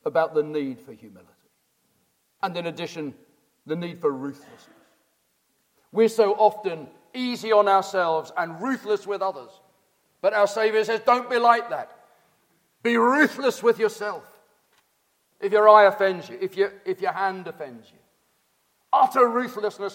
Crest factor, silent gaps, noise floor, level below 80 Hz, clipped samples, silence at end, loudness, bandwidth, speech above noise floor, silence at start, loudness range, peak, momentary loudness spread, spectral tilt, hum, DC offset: 22 dB; none; -70 dBFS; -80 dBFS; under 0.1%; 0 s; -22 LUFS; 16.5 kHz; 47 dB; 0.05 s; 11 LU; -2 dBFS; 15 LU; -4.5 dB/octave; none; under 0.1%